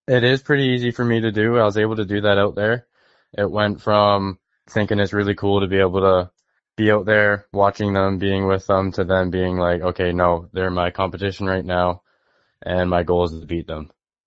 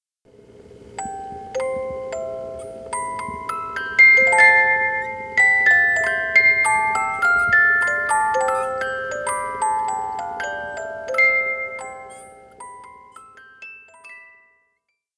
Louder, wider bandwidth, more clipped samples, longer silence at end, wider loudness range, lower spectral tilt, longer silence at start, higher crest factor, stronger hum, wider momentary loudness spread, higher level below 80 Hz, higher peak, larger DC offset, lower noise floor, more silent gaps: about the same, -19 LUFS vs -17 LUFS; second, 7.8 kHz vs 11 kHz; neither; second, 0.4 s vs 0.95 s; second, 3 LU vs 14 LU; first, -7.5 dB/octave vs -2 dB/octave; second, 0.1 s vs 0.85 s; about the same, 18 dB vs 20 dB; neither; second, 9 LU vs 20 LU; first, -46 dBFS vs -54 dBFS; about the same, 0 dBFS vs -2 dBFS; neither; second, -64 dBFS vs -73 dBFS; neither